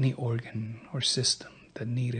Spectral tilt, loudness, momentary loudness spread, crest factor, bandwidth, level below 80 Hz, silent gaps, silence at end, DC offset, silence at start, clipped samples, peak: -4 dB/octave; -30 LUFS; 13 LU; 18 dB; 9.4 kHz; -66 dBFS; none; 0 s; under 0.1%; 0 s; under 0.1%; -14 dBFS